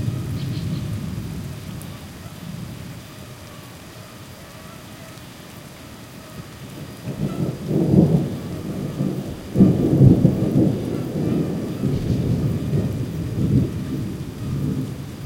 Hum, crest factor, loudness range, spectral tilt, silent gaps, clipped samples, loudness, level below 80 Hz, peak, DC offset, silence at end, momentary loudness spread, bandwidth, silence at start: none; 20 dB; 19 LU; -8 dB/octave; none; under 0.1%; -21 LUFS; -42 dBFS; -2 dBFS; under 0.1%; 0 s; 22 LU; 16.5 kHz; 0 s